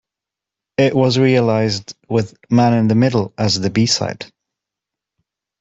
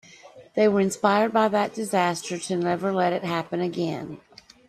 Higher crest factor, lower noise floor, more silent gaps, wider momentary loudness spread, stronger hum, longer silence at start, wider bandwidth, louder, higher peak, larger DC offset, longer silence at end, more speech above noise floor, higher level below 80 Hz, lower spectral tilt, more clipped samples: second, 14 dB vs 20 dB; first, -86 dBFS vs -48 dBFS; neither; about the same, 11 LU vs 10 LU; neither; first, 0.8 s vs 0.25 s; second, 8 kHz vs 13.5 kHz; first, -16 LUFS vs -24 LUFS; first, -2 dBFS vs -6 dBFS; neither; first, 1.35 s vs 0.5 s; first, 70 dB vs 25 dB; first, -52 dBFS vs -68 dBFS; about the same, -5.5 dB/octave vs -5 dB/octave; neither